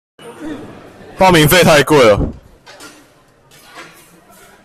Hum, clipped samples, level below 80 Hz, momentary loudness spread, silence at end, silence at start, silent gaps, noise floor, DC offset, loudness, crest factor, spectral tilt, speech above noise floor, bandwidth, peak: none; under 0.1%; -34 dBFS; 21 LU; 0.8 s; 0.25 s; none; -48 dBFS; under 0.1%; -10 LUFS; 14 dB; -4.5 dB/octave; 39 dB; 16 kHz; 0 dBFS